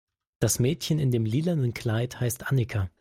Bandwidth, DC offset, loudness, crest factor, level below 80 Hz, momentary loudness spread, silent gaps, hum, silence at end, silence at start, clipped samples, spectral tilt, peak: 16 kHz; under 0.1%; -27 LUFS; 16 dB; -54 dBFS; 5 LU; none; none; 0.15 s; 0.4 s; under 0.1%; -5.5 dB/octave; -10 dBFS